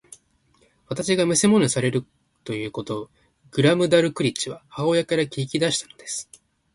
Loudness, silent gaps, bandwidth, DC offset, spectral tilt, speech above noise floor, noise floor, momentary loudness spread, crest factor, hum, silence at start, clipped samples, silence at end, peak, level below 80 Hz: -22 LUFS; none; 11.5 kHz; under 0.1%; -4.5 dB/octave; 40 dB; -62 dBFS; 14 LU; 18 dB; none; 0.9 s; under 0.1%; 0.5 s; -4 dBFS; -60 dBFS